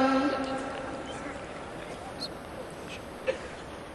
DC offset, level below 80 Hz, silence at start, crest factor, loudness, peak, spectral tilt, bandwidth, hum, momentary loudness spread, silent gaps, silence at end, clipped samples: under 0.1%; -56 dBFS; 0 s; 20 dB; -35 LUFS; -14 dBFS; -5 dB/octave; 12.5 kHz; none; 12 LU; none; 0 s; under 0.1%